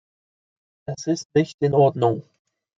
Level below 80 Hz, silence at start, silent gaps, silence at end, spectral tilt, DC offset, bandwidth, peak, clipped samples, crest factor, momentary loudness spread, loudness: -64 dBFS; 0.9 s; 1.25-1.30 s, 1.54-1.58 s; 0.55 s; -7 dB/octave; under 0.1%; 7.8 kHz; -4 dBFS; under 0.1%; 18 dB; 15 LU; -21 LUFS